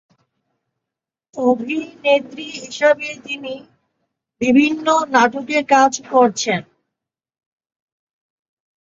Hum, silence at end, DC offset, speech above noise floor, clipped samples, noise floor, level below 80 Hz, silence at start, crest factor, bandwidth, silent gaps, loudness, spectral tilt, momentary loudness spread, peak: none; 2.2 s; under 0.1%; 68 dB; under 0.1%; -85 dBFS; -64 dBFS; 1.35 s; 18 dB; 7.8 kHz; none; -17 LUFS; -3.5 dB/octave; 15 LU; -2 dBFS